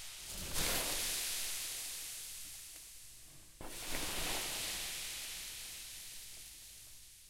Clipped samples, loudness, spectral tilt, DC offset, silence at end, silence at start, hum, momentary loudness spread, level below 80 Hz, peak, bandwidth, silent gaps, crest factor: under 0.1%; -39 LUFS; -0.5 dB/octave; under 0.1%; 0 s; 0 s; none; 17 LU; -54 dBFS; -22 dBFS; 16 kHz; none; 20 dB